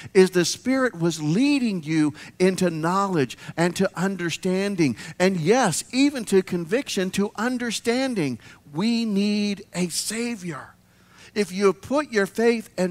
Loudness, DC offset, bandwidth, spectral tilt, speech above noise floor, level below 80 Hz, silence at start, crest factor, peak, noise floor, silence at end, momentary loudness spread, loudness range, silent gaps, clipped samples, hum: -23 LUFS; under 0.1%; 16 kHz; -5 dB/octave; 29 dB; -62 dBFS; 0 s; 20 dB; -4 dBFS; -52 dBFS; 0 s; 7 LU; 3 LU; none; under 0.1%; none